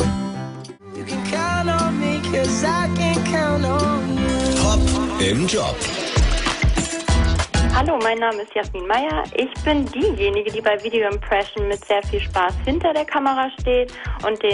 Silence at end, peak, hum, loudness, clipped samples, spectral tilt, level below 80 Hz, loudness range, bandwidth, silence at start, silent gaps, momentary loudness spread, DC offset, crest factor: 0 s; -6 dBFS; none; -20 LUFS; under 0.1%; -5 dB/octave; -28 dBFS; 2 LU; 11 kHz; 0 s; none; 6 LU; under 0.1%; 14 dB